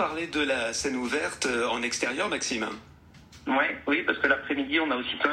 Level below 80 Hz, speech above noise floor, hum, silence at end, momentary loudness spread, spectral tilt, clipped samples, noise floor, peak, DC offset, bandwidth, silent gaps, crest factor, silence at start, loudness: -60 dBFS; 24 dB; none; 0 s; 4 LU; -2.5 dB/octave; under 0.1%; -51 dBFS; -8 dBFS; under 0.1%; 15 kHz; none; 20 dB; 0 s; -27 LUFS